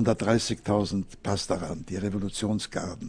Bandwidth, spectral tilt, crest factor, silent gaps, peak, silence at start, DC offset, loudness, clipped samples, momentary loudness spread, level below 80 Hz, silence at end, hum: 10.5 kHz; -5.5 dB/octave; 20 dB; none; -8 dBFS; 0 s; under 0.1%; -29 LUFS; under 0.1%; 7 LU; -48 dBFS; 0 s; none